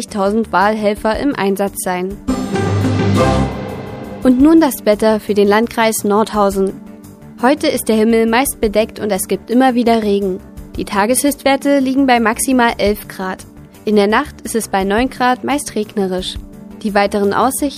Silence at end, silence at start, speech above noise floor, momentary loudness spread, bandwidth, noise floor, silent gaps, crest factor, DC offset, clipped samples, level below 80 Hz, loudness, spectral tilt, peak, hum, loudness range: 0 s; 0 s; 21 dB; 10 LU; 15.5 kHz; -35 dBFS; none; 14 dB; under 0.1%; under 0.1%; -36 dBFS; -15 LUFS; -5 dB/octave; 0 dBFS; none; 3 LU